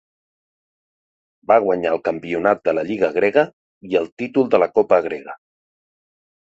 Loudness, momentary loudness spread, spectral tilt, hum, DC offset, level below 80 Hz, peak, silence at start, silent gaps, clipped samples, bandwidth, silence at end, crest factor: -19 LUFS; 9 LU; -7 dB/octave; none; under 0.1%; -60 dBFS; -2 dBFS; 1.5 s; 3.53-3.81 s, 4.12-4.17 s; under 0.1%; 7.8 kHz; 1.1 s; 18 dB